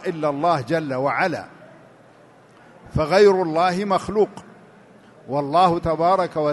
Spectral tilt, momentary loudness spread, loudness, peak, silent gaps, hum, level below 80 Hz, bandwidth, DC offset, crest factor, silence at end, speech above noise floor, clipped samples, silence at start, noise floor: -6.5 dB/octave; 11 LU; -20 LUFS; -4 dBFS; none; none; -46 dBFS; 11.5 kHz; under 0.1%; 18 dB; 0 s; 30 dB; under 0.1%; 0 s; -50 dBFS